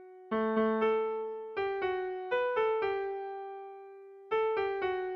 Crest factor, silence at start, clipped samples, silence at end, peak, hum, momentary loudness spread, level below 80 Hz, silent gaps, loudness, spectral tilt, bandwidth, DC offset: 14 dB; 0 s; under 0.1%; 0 s; -18 dBFS; none; 15 LU; -70 dBFS; none; -32 LUFS; -7 dB/octave; 5.6 kHz; under 0.1%